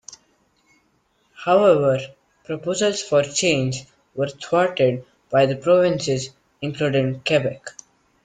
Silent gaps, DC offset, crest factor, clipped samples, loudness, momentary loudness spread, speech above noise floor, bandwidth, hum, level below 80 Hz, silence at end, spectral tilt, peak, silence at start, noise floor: none; under 0.1%; 18 dB; under 0.1%; -20 LUFS; 15 LU; 45 dB; 9.4 kHz; none; -60 dBFS; 0.55 s; -4.5 dB/octave; -4 dBFS; 0.1 s; -65 dBFS